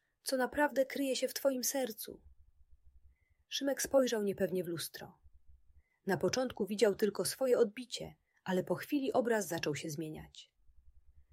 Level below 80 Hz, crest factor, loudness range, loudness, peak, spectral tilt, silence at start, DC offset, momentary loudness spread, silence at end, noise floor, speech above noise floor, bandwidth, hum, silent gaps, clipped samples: -68 dBFS; 20 dB; 3 LU; -35 LUFS; -16 dBFS; -4 dB/octave; 0.25 s; under 0.1%; 15 LU; 0.1 s; -67 dBFS; 32 dB; 16 kHz; none; none; under 0.1%